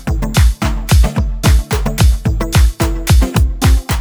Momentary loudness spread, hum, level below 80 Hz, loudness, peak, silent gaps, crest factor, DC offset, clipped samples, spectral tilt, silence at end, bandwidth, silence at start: 4 LU; none; -14 dBFS; -14 LUFS; 0 dBFS; none; 12 dB; under 0.1%; under 0.1%; -5 dB/octave; 0 s; over 20 kHz; 0 s